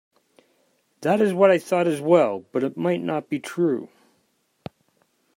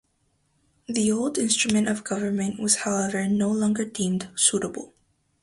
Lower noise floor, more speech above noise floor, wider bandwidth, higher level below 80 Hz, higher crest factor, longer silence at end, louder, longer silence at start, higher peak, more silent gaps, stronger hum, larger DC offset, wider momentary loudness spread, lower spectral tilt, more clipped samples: about the same, -68 dBFS vs -69 dBFS; about the same, 47 dB vs 45 dB; first, 16 kHz vs 11.5 kHz; second, -74 dBFS vs -62 dBFS; about the same, 20 dB vs 20 dB; first, 1.5 s vs 0.55 s; about the same, -22 LUFS vs -24 LUFS; about the same, 1 s vs 0.9 s; about the same, -4 dBFS vs -4 dBFS; neither; neither; neither; first, 20 LU vs 6 LU; first, -6.5 dB/octave vs -3.5 dB/octave; neither